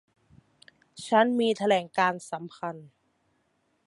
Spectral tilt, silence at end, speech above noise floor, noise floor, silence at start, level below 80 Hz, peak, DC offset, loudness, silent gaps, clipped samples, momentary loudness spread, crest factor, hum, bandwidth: -4.5 dB/octave; 1 s; 46 dB; -72 dBFS; 0.95 s; -76 dBFS; -8 dBFS; under 0.1%; -26 LUFS; none; under 0.1%; 15 LU; 22 dB; none; 11.5 kHz